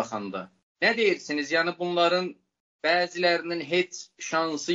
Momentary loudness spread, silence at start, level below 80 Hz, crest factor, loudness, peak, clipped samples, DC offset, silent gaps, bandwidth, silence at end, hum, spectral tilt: 11 LU; 0 s; -78 dBFS; 18 dB; -26 LUFS; -8 dBFS; under 0.1%; under 0.1%; 0.63-0.75 s, 2.60-2.79 s; 8 kHz; 0 s; none; -3.5 dB/octave